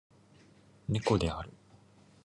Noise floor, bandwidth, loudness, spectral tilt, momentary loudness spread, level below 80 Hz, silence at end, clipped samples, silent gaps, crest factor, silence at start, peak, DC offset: -61 dBFS; 11.5 kHz; -33 LUFS; -6.5 dB/octave; 15 LU; -50 dBFS; 0.75 s; under 0.1%; none; 22 dB; 0.9 s; -14 dBFS; under 0.1%